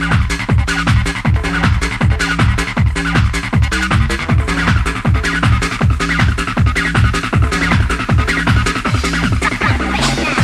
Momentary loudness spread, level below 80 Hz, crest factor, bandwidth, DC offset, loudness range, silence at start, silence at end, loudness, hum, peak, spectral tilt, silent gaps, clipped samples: 2 LU; -20 dBFS; 12 dB; 13 kHz; under 0.1%; 1 LU; 0 s; 0 s; -15 LUFS; none; 0 dBFS; -5 dB/octave; none; under 0.1%